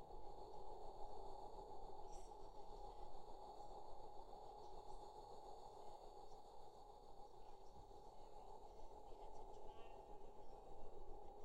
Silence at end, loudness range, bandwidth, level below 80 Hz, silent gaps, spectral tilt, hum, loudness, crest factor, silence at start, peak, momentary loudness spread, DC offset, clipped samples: 0 s; 4 LU; 9 kHz; -62 dBFS; none; -5.5 dB/octave; none; -60 LUFS; 14 dB; 0 s; -38 dBFS; 6 LU; under 0.1%; under 0.1%